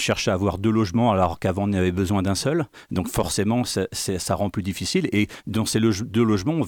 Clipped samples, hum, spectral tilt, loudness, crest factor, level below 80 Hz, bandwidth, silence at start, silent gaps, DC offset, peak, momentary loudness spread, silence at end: under 0.1%; none; -5.5 dB/octave; -23 LUFS; 14 dB; -46 dBFS; 19 kHz; 0 s; none; under 0.1%; -8 dBFS; 6 LU; 0 s